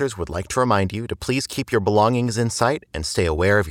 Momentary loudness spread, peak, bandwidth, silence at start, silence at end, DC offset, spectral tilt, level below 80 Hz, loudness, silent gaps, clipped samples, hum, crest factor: 8 LU; -4 dBFS; 17.5 kHz; 0 s; 0 s; under 0.1%; -5 dB/octave; -42 dBFS; -21 LUFS; none; under 0.1%; none; 18 dB